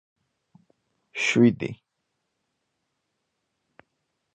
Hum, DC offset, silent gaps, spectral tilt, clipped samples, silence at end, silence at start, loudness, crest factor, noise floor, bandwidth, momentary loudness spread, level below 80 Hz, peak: none; under 0.1%; none; -5.5 dB/octave; under 0.1%; 2.6 s; 1.15 s; -23 LUFS; 22 dB; -79 dBFS; 8.8 kHz; 20 LU; -68 dBFS; -6 dBFS